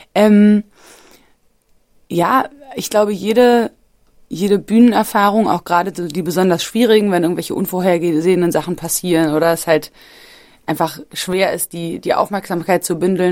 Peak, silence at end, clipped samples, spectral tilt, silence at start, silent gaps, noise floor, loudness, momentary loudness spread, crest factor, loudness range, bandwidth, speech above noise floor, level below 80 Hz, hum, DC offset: 0 dBFS; 0 s; under 0.1%; -5 dB/octave; 0.15 s; none; -56 dBFS; -15 LUFS; 10 LU; 16 dB; 4 LU; 16.5 kHz; 41 dB; -54 dBFS; none; under 0.1%